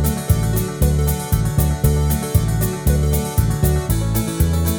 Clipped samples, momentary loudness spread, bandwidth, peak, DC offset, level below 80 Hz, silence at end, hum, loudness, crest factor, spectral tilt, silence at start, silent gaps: under 0.1%; 2 LU; over 20 kHz; -2 dBFS; under 0.1%; -22 dBFS; 0 s; none; -19 LUFS; 14 dB; -6 dB/octave; 0 s; none